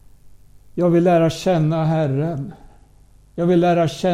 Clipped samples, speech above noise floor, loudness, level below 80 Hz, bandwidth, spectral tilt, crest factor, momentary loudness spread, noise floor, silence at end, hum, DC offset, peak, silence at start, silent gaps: under 0.1%; 32 dB; -18 LUFS; -48 dBFS; 12 kHz; -7.5 dB/octave; 14 dB; 15 LU; -49 dBFS; 0 s; 50 Hz at -40 dBFS; under 0.1%; -4 dBFS; 0.25 s; none